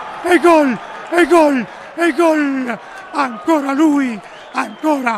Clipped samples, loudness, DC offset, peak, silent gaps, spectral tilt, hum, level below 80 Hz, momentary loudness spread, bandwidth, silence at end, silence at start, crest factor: under 0.1%; -15 LUFS; under 0.1%; 0 dBFS; none; -4.5 dB/octave; none; -58 dBFS; 14 LU; 14 kHz; 0 s; 0 s; 16 dB